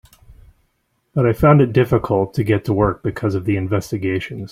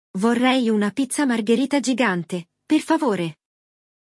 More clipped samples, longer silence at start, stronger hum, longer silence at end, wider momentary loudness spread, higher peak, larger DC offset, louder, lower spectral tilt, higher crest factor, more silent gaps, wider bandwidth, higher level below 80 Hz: neither; first, 1.15 s vs 0.15 s; neither; second, 0.05 s vs 0.85 s; about the same, 9 LU vs 8 LU; about the same, -2 dBFS vs -4 dBFS; neither; first, -18 LUFS vs -21 LUFS; first, -8.5 dB/octave vs -4.5 dB/octave; about the same, 16 dB vs 18 dB; neither; first, 15.5 kHz vs 12 kHz; first, -40 dBFS vs -72 dBFS